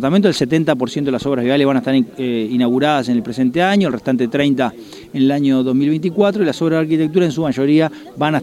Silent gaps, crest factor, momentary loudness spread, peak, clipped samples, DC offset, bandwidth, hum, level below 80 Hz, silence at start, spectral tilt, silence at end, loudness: none; 14 dB; 5 LU; 0 dBFS; under 0.1%; under 0.1%; 13 kHz; none; -54 dBFS; 0 s; -6.5 dB/octave; 0 s; -16 LUFS